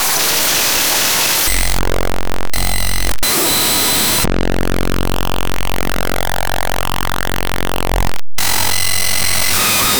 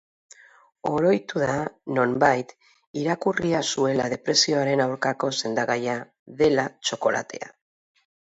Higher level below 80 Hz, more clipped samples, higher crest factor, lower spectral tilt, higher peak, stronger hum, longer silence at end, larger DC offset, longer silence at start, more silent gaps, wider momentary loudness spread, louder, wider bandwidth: first, -26 dBFS vs -62 dBFS; neither; second, 12 dB vs 20 dB; second, -2 dB/octave vs -4 dB/octave; first, 0 dBFS vs -6 dBFS; neither; second, 0 s vs 0.85 s; neither; second, 0 s vs 0.85 s; second, none vs 2.87-2.94 s, 6.19-6.26 s; second, 9 LU vs 12 LU; first, -15 LUFS vs -24 LUFS; first, over 20 kHz vs 8.2 kHz